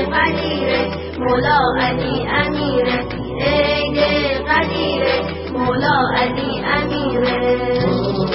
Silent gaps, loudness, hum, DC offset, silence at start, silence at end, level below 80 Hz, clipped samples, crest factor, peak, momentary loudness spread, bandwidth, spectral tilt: none; -17 LUFS; none; under 0.1%; 0 s; 0 s; -34 dBFS; under 0.1%; 16 dB; -2 dBFS; 5 LU; 5.8 kHz; -10 dB/octave